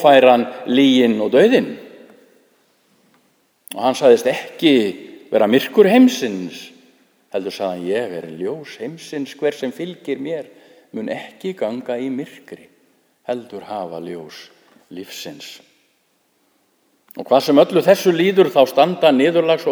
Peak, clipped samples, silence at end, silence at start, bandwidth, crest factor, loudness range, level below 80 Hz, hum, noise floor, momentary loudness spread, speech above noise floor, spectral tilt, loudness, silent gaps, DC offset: 0 dBFS; under 0.1%; 0 s; 0 s; over 20 kHz; 18 dB; 16 LU; -70 dBFS; none; -63 dBFS; 20 LU; 47 dB; -5 dB/octave; -17 LUFS; none; under 0.1%